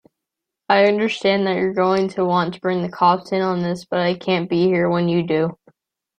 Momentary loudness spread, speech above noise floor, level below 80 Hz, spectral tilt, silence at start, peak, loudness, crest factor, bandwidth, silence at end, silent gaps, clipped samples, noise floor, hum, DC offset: 5 LU; 65 dB; -62 dBFS; -7 dB/octave; 0.7 s; -2 dBFS; -19 LUFS; 18 dB; 9.4 kHz; 0.65 s; none; under 0.1%; -83 dBFS; none; under 0.1%